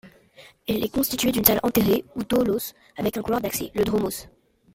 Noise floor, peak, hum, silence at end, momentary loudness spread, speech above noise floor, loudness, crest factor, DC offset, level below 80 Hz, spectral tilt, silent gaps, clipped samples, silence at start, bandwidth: -52 dBFS; 0 dBFS; none; 0.45 s; 11 LU; 28 dB; -23 LUFS; 24 dB; under 0.1%; -48 dBFS; -4.5 dB/octave; none; under 0.1%; 0.05 s; 16.5 kHz